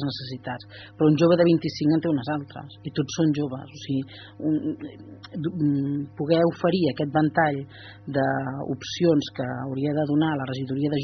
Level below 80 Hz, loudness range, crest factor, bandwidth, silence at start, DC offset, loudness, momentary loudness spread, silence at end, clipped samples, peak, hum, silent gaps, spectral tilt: -62 dBFS; 5 LU; 18 dB; 6.4 kHz; 0 s; under 0.1%; -25 LUFS; 15 LU; 0 s; under 0.1%; -6 dBFS; none; none; -6 dB/octave